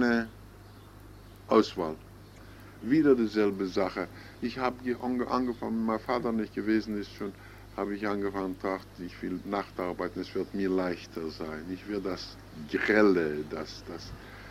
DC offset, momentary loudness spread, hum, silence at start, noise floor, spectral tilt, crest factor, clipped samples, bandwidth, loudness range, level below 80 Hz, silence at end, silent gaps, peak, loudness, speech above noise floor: under 0.1%; 23 LU; 50 Hz at -55 dBFS; 0 s; -50 dBFS; -6.5 dB/octave; 22 dB; under 0.1%; 15.5 kHz; 5 LU; -56 dBFS; 0 s; none; -10 dBFS; -30 LUFS; 20 dB